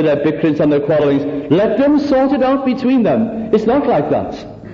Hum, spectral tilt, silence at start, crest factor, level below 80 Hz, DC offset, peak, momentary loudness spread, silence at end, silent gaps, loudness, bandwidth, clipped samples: none; -8.5 dB/octave; 0 s; 12 dB; -44 dBFS; under 0.1%; -2 dBFS; 5 LU; 0 s; none; -14 LUFS; 7 kHz; under 0.1%